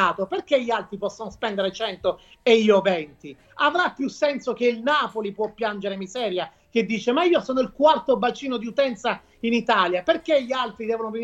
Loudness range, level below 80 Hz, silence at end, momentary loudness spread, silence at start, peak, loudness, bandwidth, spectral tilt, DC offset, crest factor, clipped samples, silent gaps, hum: 3 LU; -60 dBFS; 0 s; 9 LU; 0 s; -4 dBFS; -23 LUFS; 8.2 kHz; -4.5 dB/octave; under 0.1%; 18 dB; under 0.1%; none; none